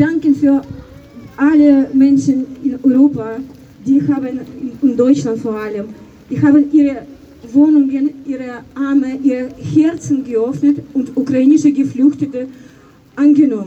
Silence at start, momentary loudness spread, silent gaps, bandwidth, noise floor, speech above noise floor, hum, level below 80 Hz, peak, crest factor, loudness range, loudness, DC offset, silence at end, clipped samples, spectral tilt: 0 s; 15 LU; none; 8.2 kHz; -42 dBFS; 29 dB; none; -50 dBFS; 0 dBFS; 14 dB; 3 LU; -14 LUFS; under 0.1%; 0 s; under 0.1%; -7.5 dB/octave